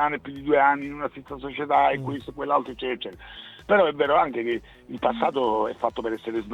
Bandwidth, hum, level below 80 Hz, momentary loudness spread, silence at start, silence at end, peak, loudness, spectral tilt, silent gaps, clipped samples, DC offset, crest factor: 9.6 kHz; none; -54 dBFS; 14 LU; 0 s; 0 s; -6 dBFS; -24 LUFS; -6.5 dB/octave; none; under 0.1%; under 0.1%; 18 dB